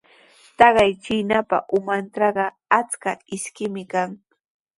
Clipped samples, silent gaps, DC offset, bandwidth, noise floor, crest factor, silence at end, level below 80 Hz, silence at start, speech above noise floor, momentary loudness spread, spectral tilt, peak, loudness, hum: under 0.1%; none; under 0.1%; 11.5 kHz; -53 dBFS; 22 dB; 0.65 s; -56 dBFS; 0.6 s; 32 dB; 13 LU; -4 dB/octave; 0 dBFS; -21 LUFS; none